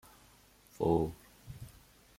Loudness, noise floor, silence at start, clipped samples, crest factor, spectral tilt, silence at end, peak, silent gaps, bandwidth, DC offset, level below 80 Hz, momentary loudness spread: -33 LUFS; -62 dBFS; 0.8 s; under 0.1%; 22 dB; -8 dB/octave; 0.5 s; -16 dBFS; none; 16.5 kHz; under 0.1%; -56 dBFS; 22 LU